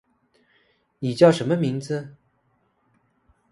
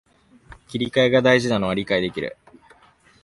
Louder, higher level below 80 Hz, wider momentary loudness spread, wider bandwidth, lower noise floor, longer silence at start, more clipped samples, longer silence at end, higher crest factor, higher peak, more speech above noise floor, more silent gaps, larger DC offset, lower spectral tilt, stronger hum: about the same, -21 LUFS vs -20 LUFS; second, -66 dBFS vs -52 dBFS; about the same, 14 LU vs 15 LU; about the same, 11.5 kHz vs 11.5 kHz; first, -67 dBFS vs -55 dBFS; first, 1 s vs 0.5 s; neither; first, 1.4 s vs 0.95 s; about the same, 24 dB vs 20 dB; about the same, -2 dBFS vs -4 dBFS; first, 47 dB vs 35 dB; neither; neither; first, -7 dB/octave vs -5.5 dB/octave; neither